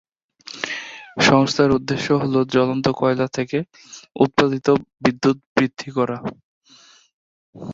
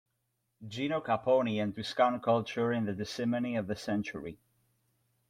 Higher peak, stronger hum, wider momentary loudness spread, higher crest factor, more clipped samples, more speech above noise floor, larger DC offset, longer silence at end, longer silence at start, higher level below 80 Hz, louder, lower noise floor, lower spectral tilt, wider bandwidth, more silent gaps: first, 0 dBFS vs -14 dBFS; neither; first, 17 LU vs 12 LU; about the same, 20 dB vs 20 dB; neither; second, 32 dB vs 49 dB; neither; second, 0 s vs 0.95 s; second, 0.45 s vs 0.6 s; first, -54 dBFS vs -70 dBFS; first, -20 LUFS vs -32 LUFS; second, -51 dBFS vs -80 dBFS; about the same, -5.5 dB/octave vs -6 dB/octave; second, 7.8 kHz vs 14.5 kHz; first, 5.46-5.56 s, 6.44-6.61 s, 7.13-7.53 s vs none